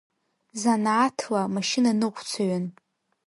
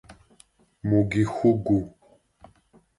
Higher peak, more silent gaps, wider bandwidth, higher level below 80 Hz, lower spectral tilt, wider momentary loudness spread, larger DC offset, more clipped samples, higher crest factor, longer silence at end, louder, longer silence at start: about the same, -8 dBFS vs -8 dBFS; neither; about the same, 11.5 kHz vs 11.5 kHz; second, -74 dBFS vs -50 dBFS; second, -4.5 dB/octave vs -8.5 dB/octave; about the same, 8 LU vs 10 LU; neither; neither; about the same, 16 dB vs 18 dB; second, 0.55 s vs 1.1 s; about the same, -25 LUFS vs -24 LUFS; first, 0.55 s vs 0.1 s